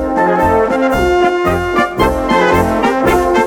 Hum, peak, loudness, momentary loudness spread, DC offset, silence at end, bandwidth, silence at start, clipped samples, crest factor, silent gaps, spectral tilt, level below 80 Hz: none; 0 dBFS; -12 LUFS; 3 LU; under 0.1%; 0 s; 19 kHz; 0 s; under 0.1%; 12 dB; none; -6 dB/octave; -28 dBFS